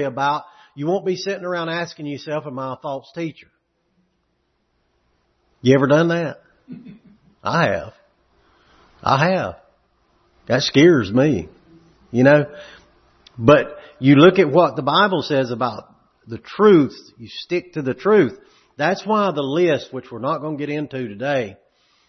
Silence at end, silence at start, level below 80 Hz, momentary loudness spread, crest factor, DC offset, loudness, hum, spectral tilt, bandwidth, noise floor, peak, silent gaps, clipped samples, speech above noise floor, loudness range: 0.55 s; 0 s; -56 dBFS; 17 LU; 20 dB; under 0.1%; -18 LUFS; none; -6.5 dB/octave; 6.4 kHz; -68 dBFS; 0 dBFS; none; under 0.1%; 50 dB; 10 LU